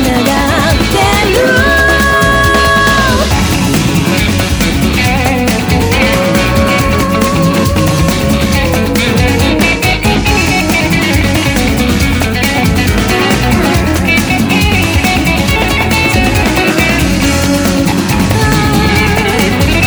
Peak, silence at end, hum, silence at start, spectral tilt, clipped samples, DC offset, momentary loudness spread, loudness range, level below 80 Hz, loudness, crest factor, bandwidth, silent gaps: 0 dBFS; 0 s; none; 0 s; -4.5 dB/octave; under 0.1%; under 0.1%; 3 LU; 2 LU; -20 dBFS; -10 LUFS; 10 dB; over 20 kHz; none